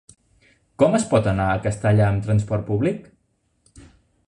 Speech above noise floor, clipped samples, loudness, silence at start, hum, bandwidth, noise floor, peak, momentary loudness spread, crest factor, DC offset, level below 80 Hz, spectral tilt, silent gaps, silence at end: 48 dB; under 0.1%; -20 LUFS; 0.8 s; none; 11 kHz; -68 dBFS; -2 dBFS; 5 LU; 20 dB; under 0.1%; -42 dBFS; -7 dB/octave; none; 1.25 s